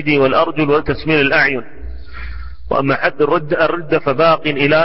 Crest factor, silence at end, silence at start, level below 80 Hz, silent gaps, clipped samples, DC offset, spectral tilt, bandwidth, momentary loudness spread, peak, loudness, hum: 14 dB; 0 s; 0 s; -36 dBFS; none; under 0.1%; 4%; -10 dB/octave; 5.8 kHz; 19 LU; -2 dBFS; -15 LUFS; none